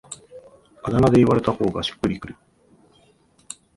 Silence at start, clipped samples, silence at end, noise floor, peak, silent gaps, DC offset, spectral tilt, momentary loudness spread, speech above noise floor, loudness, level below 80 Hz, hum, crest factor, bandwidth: 0.1 s; under 0.1%; 1.45 s; -58 dBFS; -4 dBFS; none; under 0.1%; -6.5 dB/octave; 24 LU; 39 dB; -20 LUFS; -46 dBFS; none; 20 dB; 11.5 kHz